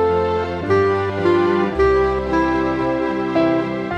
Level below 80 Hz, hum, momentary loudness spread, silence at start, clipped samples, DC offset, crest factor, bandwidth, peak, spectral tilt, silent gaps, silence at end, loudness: -36 dBFS; none; 4 LU; 0 s; under 0.1%; under 0.1%; 12 dB; 8.4 kHz; -6 dBFS; -7.5 dB/octave; none; 0 s; -18 LUFS